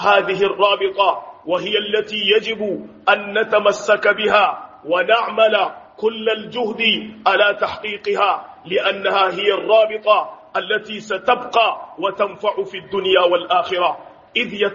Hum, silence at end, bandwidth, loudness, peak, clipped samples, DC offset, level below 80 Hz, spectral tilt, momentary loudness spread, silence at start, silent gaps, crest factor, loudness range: none; 0 s; 7.4 kHz; -18 LUFS; 0 dBFS; under 0.1%; under 0.1%; -64 dBFS; 0 dB/octave; 9 LU; 0 s; none; 18 dB; 2 LU